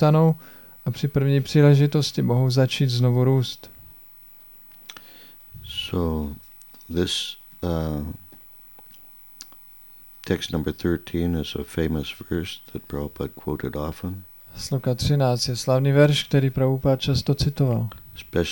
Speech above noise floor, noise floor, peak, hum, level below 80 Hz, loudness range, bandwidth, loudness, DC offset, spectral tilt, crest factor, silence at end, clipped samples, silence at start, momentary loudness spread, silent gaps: 26 dB; -47 dBFS; -4 dBFS; none; -42 dBFS; 11 LU; 17 kHz; -23 LUFS; 0.2%; -6.5 dB/octave; 20 dB; 0 s; under 0.1%; 0 s; 25 LU; none